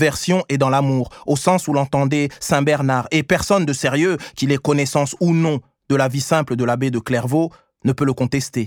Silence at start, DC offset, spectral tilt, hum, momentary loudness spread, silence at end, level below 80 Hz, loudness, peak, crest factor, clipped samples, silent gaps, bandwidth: 0 s; under 0.1%; -5.5 dB/octave; none; 4 LU; 0 s; -50 dBFS; -19 LUFS; 0 dBFS; 18 dB; under 0.1%; none; 18 kHz